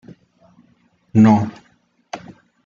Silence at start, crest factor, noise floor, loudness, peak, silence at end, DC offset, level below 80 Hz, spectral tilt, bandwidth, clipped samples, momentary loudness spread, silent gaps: 1.15 s; 18 dB; -59 dBFS; -15 LUFS; -2 dBFS; 0.5 s; under 0.1%; -58 dBFS; -8.5 dB/octave; 7.2 kHz; under 0.1%; 22 LU; none